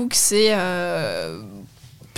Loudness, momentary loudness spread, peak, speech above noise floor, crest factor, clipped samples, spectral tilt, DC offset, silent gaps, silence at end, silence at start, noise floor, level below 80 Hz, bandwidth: -19 LUFS; 19 LU; -4 dBFS; 25 dB; 18 dB; under 0.1%; -2.5 dB/octave; under 0.1%; none; 0 s; 0 s; -46 dBFS; -54 dBFS; 17 kHz